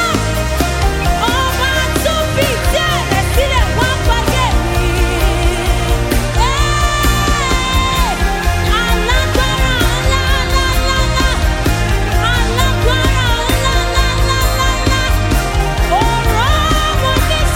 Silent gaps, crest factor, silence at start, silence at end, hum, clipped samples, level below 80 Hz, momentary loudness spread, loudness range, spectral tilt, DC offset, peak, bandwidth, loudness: none; 12 dB; 0 s; 0 s; none; under 0.1%; -16 dBFS; 2 LU; 1 LU; -4 dB/octave; under 0.1%; 0 dBFS; 17 kHz; -14 LUFS